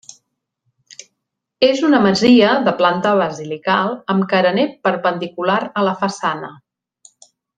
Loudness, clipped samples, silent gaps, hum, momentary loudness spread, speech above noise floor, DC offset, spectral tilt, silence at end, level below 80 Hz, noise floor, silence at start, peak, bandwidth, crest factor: -16 LUFS; under 0.1%; none; none; 11 LU; 61 dB; under 0.1%; -5.5 dB/octave; 1.05 s; -60 dBFS; -77 dBFS; 1.6 s; 0 dBFS; 9.4 kHz; 18 dB